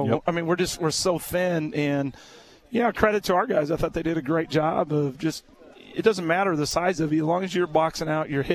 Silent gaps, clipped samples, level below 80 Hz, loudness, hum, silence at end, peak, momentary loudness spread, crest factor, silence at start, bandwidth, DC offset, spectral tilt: none; under 0.1%; -48 dBFS; -24 LUFS; none; 0 s; -2 dBFS; 5 LU; 22 dB; 0 s; 14 kHz; under 0.1%; -5 dB/octave